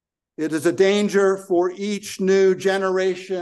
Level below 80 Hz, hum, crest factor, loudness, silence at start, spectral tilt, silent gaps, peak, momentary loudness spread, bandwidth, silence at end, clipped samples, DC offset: -70 dBFS; none; 14 dB; -20 LUFS; 0.4 s; -5 dB/octave; none; -6 dBFS; 9 LU; 12.5 kHz; 0 s; under 0.1%; under 0.1%